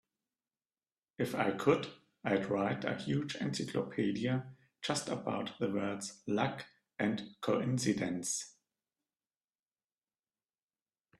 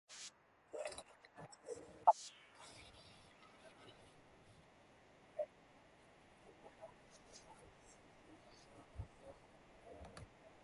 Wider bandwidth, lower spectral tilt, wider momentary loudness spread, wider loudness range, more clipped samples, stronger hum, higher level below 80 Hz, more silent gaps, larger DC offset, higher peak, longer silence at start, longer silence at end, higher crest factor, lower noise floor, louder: first, 13.5 kHz vs 11.5 kHz; first, -5 dB/octave vs -3.5 dB/octave; second, 8 LU vs 17 LU; second, 4 LU vs 17 LU; neither; neither; about the same, -74 dBFS vs -70 dBFS; neither; neither; about the same, -14 dBFS vs -16 dBFS; first, 1.2 s vs 0.1 s; first, 2.7 s vs 0 s; second, 22 dB vs 32 dB; first, under -90 dBFS vs -67 dBFS; first, -36 LUFS vs -44 LUFS